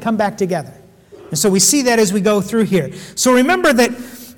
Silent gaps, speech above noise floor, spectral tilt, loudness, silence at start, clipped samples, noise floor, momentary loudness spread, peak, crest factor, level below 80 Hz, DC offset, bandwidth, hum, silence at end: none; 26 dB; -3.5 dB/octave; -14 LUFS; 0 s; under 0.1%; -41 dBFS; 11 LU; -4 dBFS; 12 dB; -52 dBFS; under 0.1%; 19 kHz; none; 0.05 s